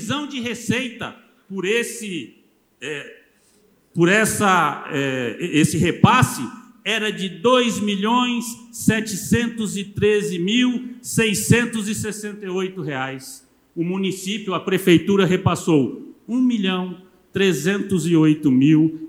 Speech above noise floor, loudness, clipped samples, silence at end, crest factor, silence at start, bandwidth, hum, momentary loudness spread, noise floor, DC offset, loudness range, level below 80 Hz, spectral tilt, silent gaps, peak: 38 dB; -20 LUFS; under 0.1%; 0 s; 20 dB; 0 s; 16.5 kHz; none; 14 LU; -58 dBFS; under 0.1%; 5 LU; -52 dBFS; -5 dB/octave; none; 0 dBFS